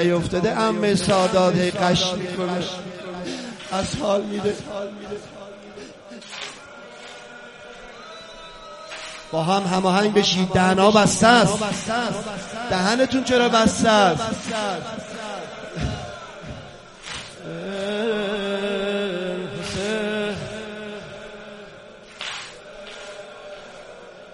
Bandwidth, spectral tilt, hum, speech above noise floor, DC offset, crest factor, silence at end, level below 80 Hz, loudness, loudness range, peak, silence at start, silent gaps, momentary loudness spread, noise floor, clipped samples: 11.5 kHz; -4.5 dB/octave; none; 23 dB; under 0.1%; 22 dB; 0 s; -48 dBFS; -21 LUFS; 18 LU; 0 dBFS; 0 s; none; 23 LU; -43 dBFS; under 0.1%